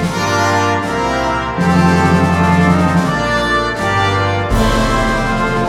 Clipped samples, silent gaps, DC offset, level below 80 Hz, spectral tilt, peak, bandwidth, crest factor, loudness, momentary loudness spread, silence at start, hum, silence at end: under 0.1%; none; under 0.1%; -26 dBFS; -5.5 dB/octave; 0 dBFS; 14.5 kHz; 14 dB; -14 LUFS; 4 LU; 0 s; none; 0 s